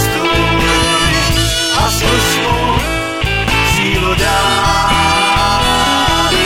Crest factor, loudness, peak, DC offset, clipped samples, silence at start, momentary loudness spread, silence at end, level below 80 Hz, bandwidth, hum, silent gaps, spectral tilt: 12 dB; -12 LUFS; 0 dBFS; under 0.1%; under 0.1%; 0 s; 3 LU; 0 s; -22 dBFS; 16.5 kHz; none; none; -3.5 dB/octave